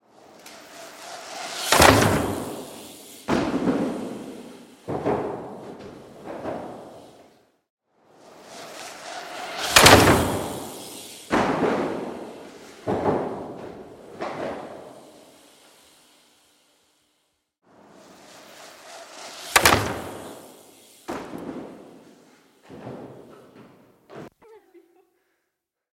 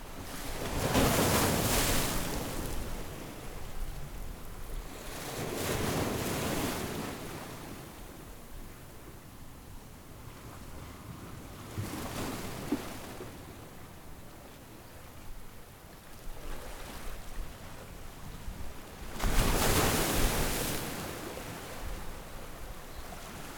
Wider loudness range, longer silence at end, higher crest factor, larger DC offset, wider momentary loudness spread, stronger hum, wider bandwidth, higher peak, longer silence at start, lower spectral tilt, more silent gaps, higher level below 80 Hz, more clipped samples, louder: first, 21 LU vs 17 LU; first, 1.35 s vs 0 s; about the same, 26 dB vs 22 dB; neither; first, 26 LU vs 22 LU; neither; second, 16.5 kHz vs over 20 kHz; first, 0 dBFS vs -12 dBFS; first, 0.45 s vs 0 s; about the same, -3.5 dB/octave vs -4 dB/octave; first, 7.70-7.77 s vs none; second, -48 dBFS vs -42 dBFS; neither; first, -21 LUFS vs -34 LUFS